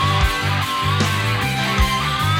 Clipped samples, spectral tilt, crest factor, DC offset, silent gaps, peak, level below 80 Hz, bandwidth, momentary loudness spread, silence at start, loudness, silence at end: under 0.1%; -4 dB/octave; 14 dB; under 0.1%; none; -4 dBFS; -28 dBFS; 17 kHz; 2 LU; 0 s; -18 LUFS; 0 s